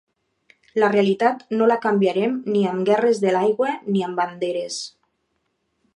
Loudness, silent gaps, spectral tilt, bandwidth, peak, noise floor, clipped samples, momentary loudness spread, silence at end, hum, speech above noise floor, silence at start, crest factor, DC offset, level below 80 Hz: -21 LUFS; none; -5.5 dB/octave; 11 kHz; -6 dBFS; -72 dBFS; under 0.1%; 9 LU; 1.05 s; none; 52 dB; 0.75 s; 16 dB; under 0.1%; -74 dBFS